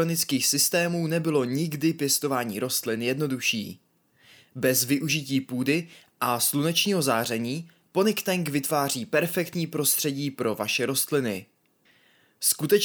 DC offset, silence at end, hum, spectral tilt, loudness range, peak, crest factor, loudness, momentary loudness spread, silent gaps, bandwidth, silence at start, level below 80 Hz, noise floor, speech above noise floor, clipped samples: under 0.1%; 0 s; none; -3.5 dB/octave; 2 LU; -10 dBFS; 18 dB; -25 LUFS; 7 LU; none; over 20 kHz; 0 s; -72 dBFS; -64 dBFS; 38 dB; under 0.1%